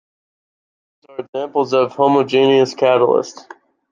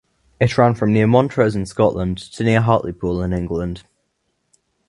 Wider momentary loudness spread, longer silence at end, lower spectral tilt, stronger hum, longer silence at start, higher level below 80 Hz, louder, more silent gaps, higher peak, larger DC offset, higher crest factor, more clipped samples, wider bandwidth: first, 16 LU vs 9 LU; second, 0.6 s vs 1.1 s; second, -5.5 dB/octave vs -7.5 dB/octave; neither; first, 1.2 s vs 0.4 s; second, -70 dBFS vs -40 dBFS; first, -15 LUFS vs -18 LUFS; first, 1.29-1.33 s vs none; about the same, -2 dBFS vs 0 dBFS; neither; about the same, 16 dB vs 18 dB; neither; second, 7.4 kHz vs 11 kHz